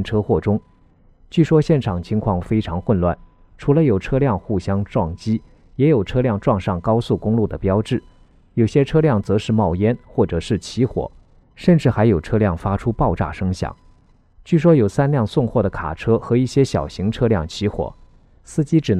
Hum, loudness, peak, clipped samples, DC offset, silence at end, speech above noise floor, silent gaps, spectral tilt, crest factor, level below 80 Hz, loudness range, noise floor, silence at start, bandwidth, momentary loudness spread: none; -19 LUFS; -2 dBFS; under 0.1%; under 0.1%; 0 s; 34 dB; none; -8 dB/octave; 16 dB; -38 dBFS; 2 LU; -52 dBFS; 0 s; 10.5 kHz; 8 LU